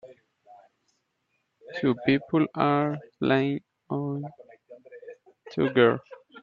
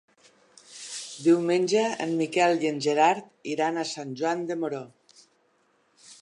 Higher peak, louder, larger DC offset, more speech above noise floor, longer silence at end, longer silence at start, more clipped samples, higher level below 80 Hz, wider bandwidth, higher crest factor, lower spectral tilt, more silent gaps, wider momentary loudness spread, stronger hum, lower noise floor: about the same, -6 dBFS vs -8 dBFS; about the same, -26 LUFS vs -26 LUFS; neither; first, 51 dB vs 42 dB; about the same, 0.05 s vs 0.1 s; second, 0.05 s vs 0.7 s; neither; first, -68 dBFS vs -82 dBFS; second, 6.8 kHz vs 11 kHz; about the same, 22 dB vs 20 dB; first, -8.5 dB/octave vs -4.5 dB/octave; neither; first, 18 LU vs 15 LU; neither; first, -76 dBFS vs -67 dBFS